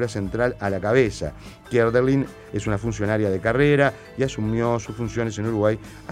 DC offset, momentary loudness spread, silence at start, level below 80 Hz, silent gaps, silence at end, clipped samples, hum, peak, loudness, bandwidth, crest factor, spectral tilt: under 0.1%; 10 LU; 0 s; -44 dBFS; none; 0 s; under 0.1%; none; -4 dBFS; -23 LUFS; 13.5 kHz; 18 dB; -6.5 dB/octave